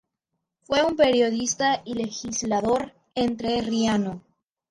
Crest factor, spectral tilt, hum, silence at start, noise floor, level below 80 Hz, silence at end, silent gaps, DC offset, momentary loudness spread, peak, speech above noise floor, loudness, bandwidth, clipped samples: 16 dB; -3.5 dB/octave; none; 0.7 s; -81 dBFS; -56 dBFS; 0.5 s; none; under 0.1%; 10 LU; -8 dBFS; 58 dB; -24 LUFS; 11 kHz; under 0.1%